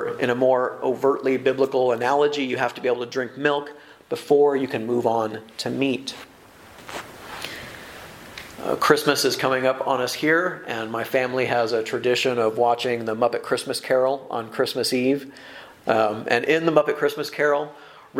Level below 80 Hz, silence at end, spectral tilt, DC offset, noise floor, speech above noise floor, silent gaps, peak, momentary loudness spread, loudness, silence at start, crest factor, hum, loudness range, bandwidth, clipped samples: -64 dBFS; 0 s; -4 dB/octave; under 0.1%; -47 dBFS; 25 dB; none; 0 dBFS; 16 LU; -22 LUFS; 0 s; 22 dB; none; 5 LU; 16.5 kHz; under 0.1%